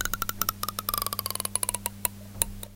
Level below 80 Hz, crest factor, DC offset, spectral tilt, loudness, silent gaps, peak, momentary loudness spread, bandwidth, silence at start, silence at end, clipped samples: -46 dBFS; 30 dB; under 0.1%; -1.5 dB/octave; -29 LUFS; none; -2 dBFS; 4 LU; 17 kHz; 0 s; 0 s; under 0.1%